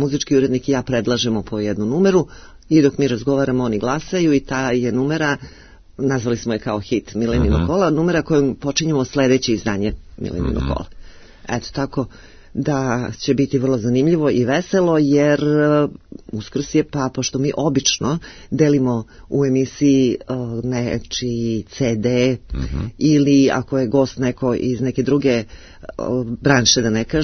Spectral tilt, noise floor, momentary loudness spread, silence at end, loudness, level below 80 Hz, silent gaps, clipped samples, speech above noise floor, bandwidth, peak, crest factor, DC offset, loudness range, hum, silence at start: -5.5 dB/octave; -38 dBFS; 10 LU; 0 s; -18 LUFS; -36 dBFS; none; under 0.1%; 20 dB; 6.6 kHz; 0 dBFS; 18 dB; under 0.1%; 4 LU; none; 0 s